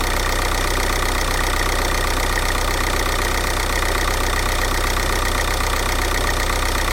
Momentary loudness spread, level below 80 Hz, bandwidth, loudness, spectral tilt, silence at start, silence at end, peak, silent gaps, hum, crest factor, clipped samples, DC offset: 0 LU; -22 dBFS; 17 kHz; -20 LUFS; -3 dB/octave; 0 s; 0 s; -6 dBFS; none; none; 14 dB; under 0.1%; under 0.1%